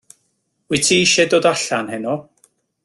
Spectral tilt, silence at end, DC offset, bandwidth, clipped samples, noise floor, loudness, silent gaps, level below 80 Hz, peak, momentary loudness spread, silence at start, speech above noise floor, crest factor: -2.5 dB/octave; 0.65 s; under 0.1%; 12.5 kHz; under 0.1%; -68 dBFS; -16 LUFS; none; -56 dBFS; -2 dBFS; 12 LU; 0.7 s; 52 dB; 18 dB